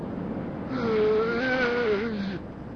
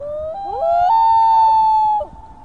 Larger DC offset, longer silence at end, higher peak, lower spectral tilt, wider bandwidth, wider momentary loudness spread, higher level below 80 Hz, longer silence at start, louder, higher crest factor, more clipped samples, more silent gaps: second, under 0.1% vs 0.5%; about the same, 0 s vs 0.1 s; second, -14 dBFS vs -6 dBFS; first, -7 dB/octave vs -5 dB/octave; about the same, 6.6 kHz vs 6.6 kHz; second, 10 LU vs 14 LU; about the same, -50 dBFS vs -46 dBFS; about the same, 0 s vs 0 s; second, -27 LUFS vs -14 LUFS; about the same, 14 dB vs 10 dB; neither; neither